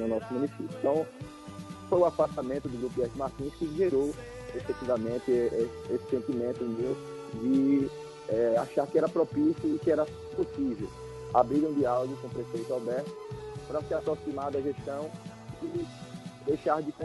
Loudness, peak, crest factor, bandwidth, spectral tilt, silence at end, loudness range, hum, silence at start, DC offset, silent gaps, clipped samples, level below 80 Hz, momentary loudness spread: -31 LUFS; -10 dBFS; 22 dB; 11.5 kHz; -7.5 dB/octave; 0 s; 6 LU; none; 0 s; under 0.1%; none; under 0.1%; -56 dBFS; 14 LU